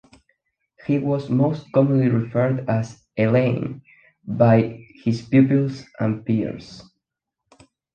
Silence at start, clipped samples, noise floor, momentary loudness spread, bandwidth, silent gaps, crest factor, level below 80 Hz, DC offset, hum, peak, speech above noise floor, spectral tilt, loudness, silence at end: 0.9 s; under 0.1%; -82 dBFS; 15 LU; 7.4 kHz; none; 18 dB; -56 dBFS; under 0.1%; none; -4 dBFS; 62 dB; -9 dB/octave; -21 LUFS; 1.15 s